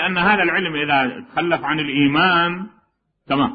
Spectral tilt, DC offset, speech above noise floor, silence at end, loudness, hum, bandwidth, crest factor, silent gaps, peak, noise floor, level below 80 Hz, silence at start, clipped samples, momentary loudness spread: -10 dB/octave; under 0.1%; 45 dB; 0 s; -18 LUFS; none; 5 kHz; 16 dB; none; -2 dBFS; -63 dBFS; -52 dBFS; 0 s; under 0.1%; 8 LU